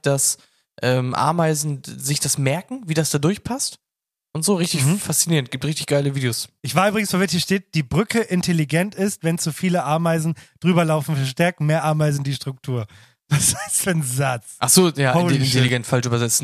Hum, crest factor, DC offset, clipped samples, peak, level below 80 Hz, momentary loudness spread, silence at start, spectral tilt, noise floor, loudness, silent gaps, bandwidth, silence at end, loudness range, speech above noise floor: none; 18 dB; under 0.1%; under 0.1%; -2 dBFS; -54 dBFS; 8 LU; 0.05 s; -4.5 dB/octave; -87 dBFS; -20 LUFS; none; 15 kHz; 0 s; 3 LU; 67 dB